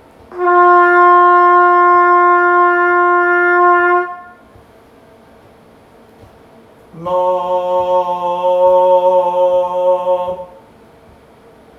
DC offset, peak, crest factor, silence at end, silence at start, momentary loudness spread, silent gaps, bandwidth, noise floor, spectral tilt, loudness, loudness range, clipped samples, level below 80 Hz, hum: under 0.1%; 0 dBFS; 12 dB; 1.35 s; 0.3 s; 11 LU; none; 6.2 kHz; -44 dBFS; -6.5 dB/octave; -11 LUFS; 12 LU; under 0.1%; -56 dBFS; none